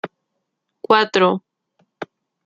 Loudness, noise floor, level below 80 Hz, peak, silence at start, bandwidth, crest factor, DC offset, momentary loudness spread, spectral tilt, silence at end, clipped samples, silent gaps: -17 LUFS; -76 dBFS; -68 dBFS; -2 dBFS; 0.05 s; 7.6 kHz; 20 dB; under 0.1%; 21 LU; -5 dB/octave; 0.4 s; under 0.1%; none